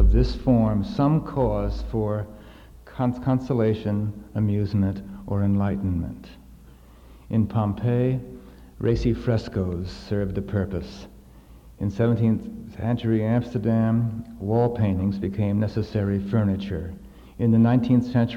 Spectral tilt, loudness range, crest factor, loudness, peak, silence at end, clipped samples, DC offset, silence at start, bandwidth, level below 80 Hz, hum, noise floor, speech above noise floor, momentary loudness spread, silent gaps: -9.5 dB/octave; 4 LU; 16 dB; -24 LUFS; -6 dBFS; 0 s; under 0.1%; under 0.1%; 0 s; 7.2 kHz; -34 dBFS; none; -48 dBFS; 25 dB; 11 LU; none